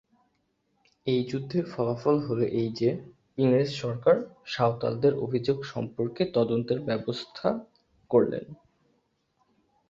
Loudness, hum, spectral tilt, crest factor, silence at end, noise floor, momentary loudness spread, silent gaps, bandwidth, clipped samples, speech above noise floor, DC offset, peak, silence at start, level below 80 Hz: -28 LUFS; none; -7.5 dB/octave; 20 dB; 1.35 s; -74 dBFS; 10 LU; none; 7.6 kHz; under 0.1%; 47 dB; under 0.1%; -8 dBFS; 1.05 s; -64 dBFS